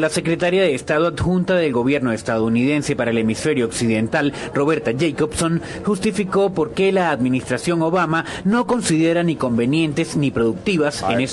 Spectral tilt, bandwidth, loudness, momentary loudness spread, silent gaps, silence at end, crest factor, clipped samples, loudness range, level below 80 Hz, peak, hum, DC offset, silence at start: -5.5 dB/octave; 12.5 kHz; -19 LUFS; 3 LU; none; 0 s; 14 dB; under 0.1%; 1 LU; -46 dBFS; -4 dBFS; none; under 0.1%; 0 s